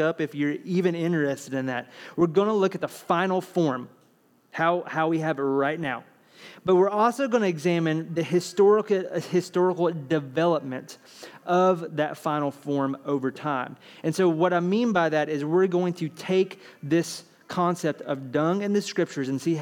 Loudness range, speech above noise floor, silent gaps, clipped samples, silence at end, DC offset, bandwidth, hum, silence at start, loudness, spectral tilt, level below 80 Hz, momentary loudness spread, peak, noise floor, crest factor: 3 LU; 37 dB; none; under 0.1%; 0 s; under 0.1%; 16.5 kHz; none; 0 s; -25 LUFS; -6.5 dB/octave; -74 dBFS; 11 LU; -8 dBFS; -62 dBFS; 16 dB